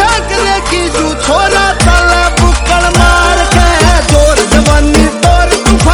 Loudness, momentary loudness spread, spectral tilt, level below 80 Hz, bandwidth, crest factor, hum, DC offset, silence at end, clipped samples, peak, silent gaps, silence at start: -8 LUFS; 4 LU; -4 dB/octave; -12 dBFS; 14.5 kHz; 8 dB; none; under 0.1%; 0 s; 4%; 0 dBFS; none; 0 s